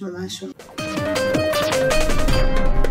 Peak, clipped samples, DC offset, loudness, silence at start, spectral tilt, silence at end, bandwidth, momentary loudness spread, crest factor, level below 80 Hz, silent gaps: -6 dBFS; under 0.1%; under 0.1%; -21 LUFS; 0 s; -4.5 dB/octave; 0 s; 16 kHz; 11 LU; 12 dB; -22 dBFS; none